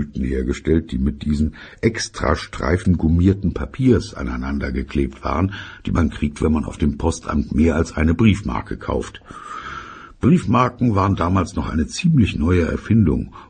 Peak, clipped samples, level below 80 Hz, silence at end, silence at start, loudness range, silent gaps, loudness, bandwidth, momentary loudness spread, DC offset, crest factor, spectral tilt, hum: 0 dBFS; under 0.1%; -30 dBFS; 0.05 s; 0 s; 3 LU; none; -20 LUFS; 9.4 kHz; 9 LU; under 0.1%; 18 dB; -7 dB/octave; none